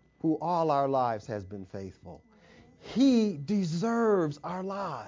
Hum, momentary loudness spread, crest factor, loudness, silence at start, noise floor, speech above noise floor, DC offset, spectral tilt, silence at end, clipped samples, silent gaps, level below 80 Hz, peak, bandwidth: none; 16 LU; 16 dB; -29 LUFS; 0.25 s; -57 dBFS; 28 dB; under 0.1%; -7 dB/octave; 0 s; under 0.1%; none; -64 dBFS; -14 dBFS; 7.6 kHz